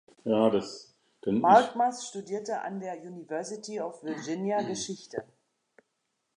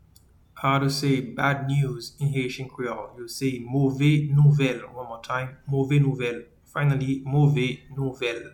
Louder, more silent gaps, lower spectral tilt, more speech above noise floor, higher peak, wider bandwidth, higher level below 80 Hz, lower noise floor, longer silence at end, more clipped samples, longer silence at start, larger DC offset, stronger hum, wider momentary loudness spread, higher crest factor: second, -29 LUFS vs -24 LUFS; neither; second, -5 dB/octave vs -7 dB/octave; first, 51 dB vs 32 dB; about the same, -6 dBFS vs -8 dBFS; second, 11 kHz vs 17 kHz; second, -74 dBFS vs -54 dBFS; first, -80 dBFS vs -56 dBFS; first, 1.15 s vs 0.05 s; neither; second, 0.25 s vs 0.55 s; neither; neither; first, 18 LU vs 12 LU; first, 24 dB vs 16 dB